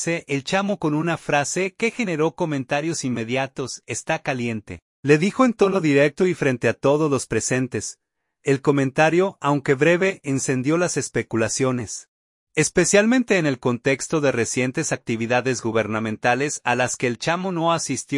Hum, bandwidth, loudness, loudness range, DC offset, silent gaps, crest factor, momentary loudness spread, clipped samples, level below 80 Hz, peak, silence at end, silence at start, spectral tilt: none; 11.5 kHz; -21 LUFS; 3 LU; under 0.1%; 4.82-5.03 s, 12.08-12.47 s; 18 dB; 8 LU; under 0.1%; -58 dBFS; -4 dBFS; 0 s; 0 s; -4.5 dB/octave